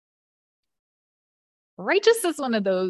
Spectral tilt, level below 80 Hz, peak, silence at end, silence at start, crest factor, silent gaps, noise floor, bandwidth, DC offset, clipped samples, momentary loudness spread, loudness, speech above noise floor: -4 dB/octave; -76 dBFS; -6 dBFS; 0 s; 1.8 s; 20 dB; none; under -90 dBFS; 13 kHz; under 0.1%; under 0.1%; 6 LU; -22 LUFS; over 68 dB